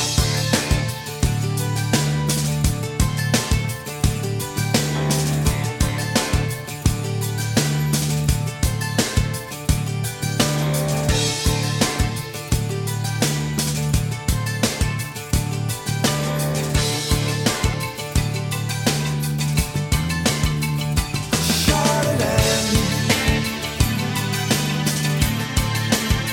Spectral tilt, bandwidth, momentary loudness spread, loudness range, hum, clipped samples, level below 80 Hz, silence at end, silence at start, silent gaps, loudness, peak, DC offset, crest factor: -4 dB/octave; 18 kHz; 5 LU; 3 LU; none; under 0.1%; -30 dBFS; 0 s; 0 s; none; -21 LUFS; -2 dBFS; under 0.1%; 20 dB